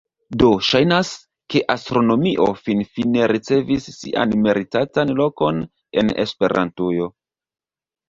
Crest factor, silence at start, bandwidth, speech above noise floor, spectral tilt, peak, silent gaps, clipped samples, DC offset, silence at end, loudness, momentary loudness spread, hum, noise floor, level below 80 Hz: 18 dB; 0.3 s; 7.8 kHz; over 72 dB; -6 dB/octave; 0 dBFS; none; under 0.1%; under 0.1%; 1 s; -19 LUFS; 8 LU; none; under -90 dBFS; -48 dBFS